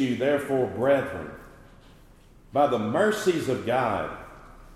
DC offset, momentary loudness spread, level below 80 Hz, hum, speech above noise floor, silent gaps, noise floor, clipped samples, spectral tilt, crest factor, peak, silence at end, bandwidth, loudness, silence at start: under 0.1%; 16 LU; -54 dBFS; none; 28 dB; none; -53 dBFS; under 0.1%; -5.5 dB/octave; 18 dB; -10 dBFS; 0 s; 14.5 kHz; -25 LUFS; 0 s